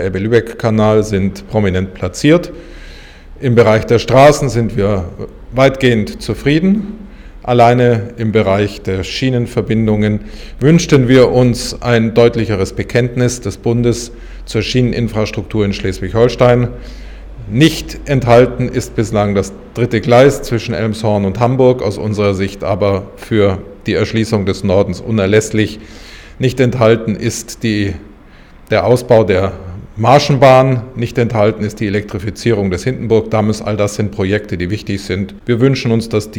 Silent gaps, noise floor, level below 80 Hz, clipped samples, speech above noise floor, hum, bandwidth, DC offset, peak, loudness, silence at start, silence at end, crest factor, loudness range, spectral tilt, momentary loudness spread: none; -39 dBFS; -34 dBFS; 0.1%; 26 dB; none; 17 kHz; under 0.1%; 0 dBFS; -13 LUFS; 0 s; 0 s; 12 dB; 4 LU; -6.5 dB/octave; 11 LU